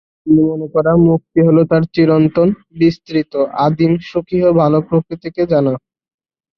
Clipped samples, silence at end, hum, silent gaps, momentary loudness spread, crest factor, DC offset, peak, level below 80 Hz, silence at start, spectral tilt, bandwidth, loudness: under 0.1%; 0.8 s; none; none; 7 LU; 12 dB; under 0.1%; -2 dBFS; -46 dBFS; 0.25 s; -10 dB/octave; 6 kHz; -14 LUFS